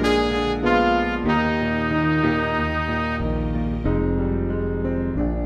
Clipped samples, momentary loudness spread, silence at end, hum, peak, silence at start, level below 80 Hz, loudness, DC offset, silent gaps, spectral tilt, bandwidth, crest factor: under 0.1%; 5 LU; 0 s; none; -6 dBFS; 0 s; -30 dBFS; -22 LUFS; under 0.1%; none; -7 dB/octave; 11 kHz; 16 dB